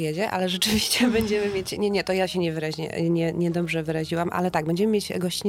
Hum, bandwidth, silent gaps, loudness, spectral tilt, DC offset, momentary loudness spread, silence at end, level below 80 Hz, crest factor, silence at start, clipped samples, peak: none; 17 kHz; none; -24 LUFS; -4.5 dB/octave; under 0.1%; 6 LU; 0 s; -50 dBFS; 16 dB; 0 s; under 0.1%; -8 dBFS